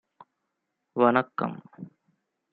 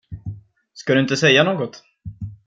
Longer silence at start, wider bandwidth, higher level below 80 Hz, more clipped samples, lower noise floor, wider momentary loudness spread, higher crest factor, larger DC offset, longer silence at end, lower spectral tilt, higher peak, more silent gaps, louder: first, 0.95 s vs 0.1 s; second, 4.7 kHz vs 9 kHz; second, -76 dBFS vs -50 dBFS; neither; first, -81 dBFS vs -40 dBFS; about the same, 24 LU vs 22 LU; about the same, 24 dB vs 20 dB; neither; first, 0.65 s vs 0.1 s; first, -10 dB/octave vs -4.5 dB/octave; second, -6 dBFS vs -2 dBFS; neither; second, -26 LUFS vs -17 LUFS